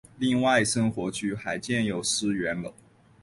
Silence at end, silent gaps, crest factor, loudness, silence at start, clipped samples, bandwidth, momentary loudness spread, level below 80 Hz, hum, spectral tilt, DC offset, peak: 0.5 s; none; 18 dB; -26 LUFS; 0.15 s; under 0.1%; 11.5 kHz; 9 LU; -58 dBFS; none; -4 dB/octave; under 0.1%; -10 dBFS